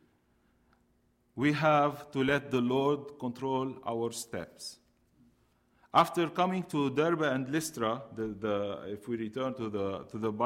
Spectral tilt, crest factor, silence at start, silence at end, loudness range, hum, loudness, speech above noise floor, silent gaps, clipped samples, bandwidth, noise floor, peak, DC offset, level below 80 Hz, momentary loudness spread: -5.5 dB/octave; 20 dB; 1.35 s; 0 s; 4 LU; none; -31 LUFS; 40 dB; none; under 0.1%; 16 kHz; -71 dBFS; -12 dBFS; under 0.1%; -68 dBFS; 12 LU